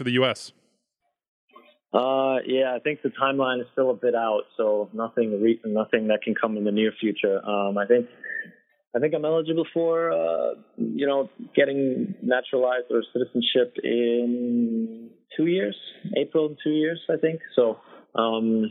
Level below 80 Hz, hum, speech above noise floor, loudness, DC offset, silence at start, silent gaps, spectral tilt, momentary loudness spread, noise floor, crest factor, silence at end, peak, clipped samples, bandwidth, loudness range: -80 dBFS; none; 54 dB; -25 LUFS; under 0.1%; 0 s; 1.28-1.48 s, 8.87-8.91 s; -6.5 dB/octave; 7 LU; -78 dBFS; 20 dB; 0 s; -6 dBFS; under 0.1%; 10.5 kHz; 2 LU